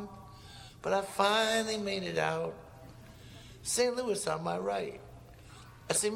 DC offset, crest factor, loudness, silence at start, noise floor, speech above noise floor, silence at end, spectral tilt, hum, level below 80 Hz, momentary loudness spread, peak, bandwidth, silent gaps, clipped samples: under 0.1%; 22 dB; -32 LUFS; 0 s; -52 dBFS; 21 dB; 0 s; -3 dB/octave; none; -60 dBFS; 24 LU; -12 dBFS; 17.5 kHz; none; under 0.1%